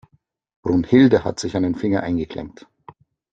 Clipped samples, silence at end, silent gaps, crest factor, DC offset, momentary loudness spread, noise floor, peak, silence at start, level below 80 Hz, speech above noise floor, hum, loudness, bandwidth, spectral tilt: under 0.1%; 0.85 s; none; 18 dB; under 0.1%; 16 LU; -61 dBFS; -2 dBFS; 0.65 s; -50 dBFS; 42 dB; none; -19 LUFS; 8.8 kHz; -6.5 dB/octave